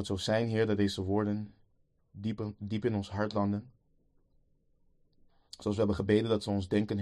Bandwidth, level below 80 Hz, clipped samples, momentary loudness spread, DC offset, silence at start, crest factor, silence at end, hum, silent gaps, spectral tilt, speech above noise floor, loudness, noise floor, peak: 12 kHz; -60 dBFS; under 0.1%; 10 LU; under 0.1%; 0 s; 20 dB; 0 s; none; none; -6.5 dB/octave; 39 dB; -32 LUFS; -70 dBFS; -14 dBFS